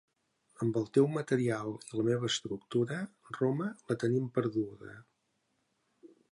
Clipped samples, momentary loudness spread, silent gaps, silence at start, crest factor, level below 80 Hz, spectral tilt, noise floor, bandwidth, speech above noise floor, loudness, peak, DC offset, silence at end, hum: under 0.1%; 10 LU; none; 0.6 s; 20 dB; -74 dBFS; -6 dB/octave; -78 dBFS; 11.5 kHz; 46 dB; -33 LUFS; -14 dBFS; under 0.1%; 0.25 s; none